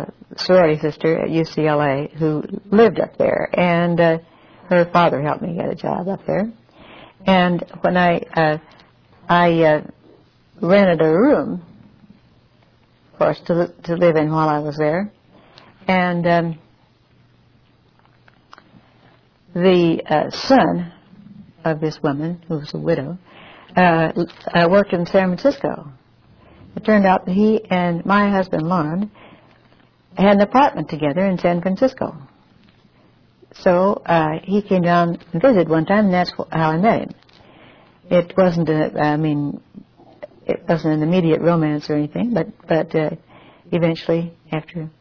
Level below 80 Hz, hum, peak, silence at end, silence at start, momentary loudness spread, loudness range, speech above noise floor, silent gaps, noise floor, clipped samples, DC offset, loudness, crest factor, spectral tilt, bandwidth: -52 dBFS; none; 0 dBFS; 0.1 s; 0 s; 12 LU; 4 LU; 38 dB; none; -55 dBFS; under 0.1%; under 0.1%; -18 LUFS; 18 dB; -8 dB/octave; 5.4 kHz